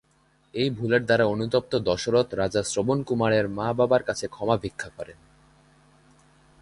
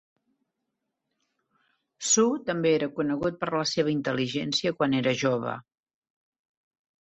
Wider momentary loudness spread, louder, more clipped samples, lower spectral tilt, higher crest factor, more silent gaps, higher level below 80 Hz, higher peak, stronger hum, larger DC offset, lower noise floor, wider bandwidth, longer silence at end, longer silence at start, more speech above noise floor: first, 13 LU vs 7 LU; about the same, -24 LUFS vs -26 LUFS; neither; first, -5 dB/octave vs -3.5 dB/octave; about the same, 18 dB vs 20 dB; neither; first, -54 dBFS vs -66 dBFS; first, -6 dBFS vs -10 dBFS; neither; neither; second, -63 dBFS vs -82 dBFS; first, 11.5 kHz vs 8.4 kHz; about the same, 1.5 s vs 1.45 s; second, 0.55 s vs 2 s; second, 39 dB vs 56 dB